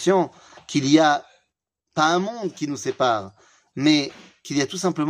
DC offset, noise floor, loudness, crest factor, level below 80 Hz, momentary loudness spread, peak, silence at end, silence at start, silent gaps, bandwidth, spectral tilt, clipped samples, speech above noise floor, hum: under 0.1%; -77 dBFS; -22 LUFS; 20 dB; -70 dBFS; 14 LU; -4 dBFS; 0 s; 0 s; none; 11 kHz; -4.5 dB/octave; under 0.1%; 56 dB; none